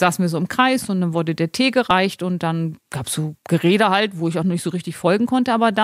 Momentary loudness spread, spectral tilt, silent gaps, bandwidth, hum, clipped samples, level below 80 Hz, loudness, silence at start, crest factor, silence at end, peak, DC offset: 9 LU; -5.5 dB/octave; none; 15.5 kHz; none; under 0.1%; -60 dBFS; -19 LUFS; 0 s; 18 dB; 0 s; -2 dBFS; under 0.1%